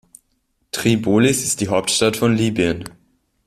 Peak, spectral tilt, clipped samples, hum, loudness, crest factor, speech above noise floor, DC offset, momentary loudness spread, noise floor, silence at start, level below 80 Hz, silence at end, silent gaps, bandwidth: -2 dBFS; -4.5 dB/octave; under 0.1%; none; -18 LUFS; 16 dB; 50 dB; under 0.1%; 10 LU; -67 dBFS; 0.75 s; -50 dBFS; 0.55 s; none; 15.5 kHz